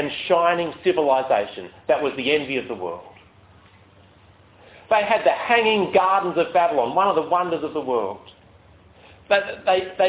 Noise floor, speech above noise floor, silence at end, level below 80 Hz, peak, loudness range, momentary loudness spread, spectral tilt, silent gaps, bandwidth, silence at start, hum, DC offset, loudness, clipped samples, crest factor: -52 dBFS; 31 dB; 0 s; -60 dBFS; -4 dBFS; 7 LU; 11 LU; -8.5 dB/octave; none; 4 kHz; 0 s; none; under 0.1%; -21 LUFS; under 0.1%; 18 dB